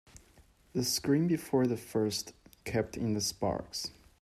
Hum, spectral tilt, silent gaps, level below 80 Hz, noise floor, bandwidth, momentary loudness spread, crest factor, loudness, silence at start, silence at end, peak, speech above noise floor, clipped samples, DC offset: none; -4.5 dB/octave; none; -60 dBFS; -62 dBFS; 15.5 kHz; 10 LU; 16 dB; -32 LUFS; 0.75 s; 0.3 s; -16 dBFS; 31 dB; under 0.1%; under 0.1%